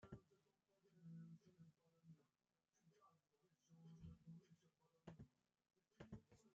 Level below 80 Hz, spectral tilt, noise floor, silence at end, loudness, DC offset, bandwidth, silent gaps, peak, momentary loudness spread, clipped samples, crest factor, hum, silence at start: -82 dBFS; -8 dB/octave; under -90 dBFS; 0 s; -65 LUFS; under 0.1%; 7.2 kHz; none; -46 dBFS; 6 LU; under 0.1%; 22 dB; none; 0 s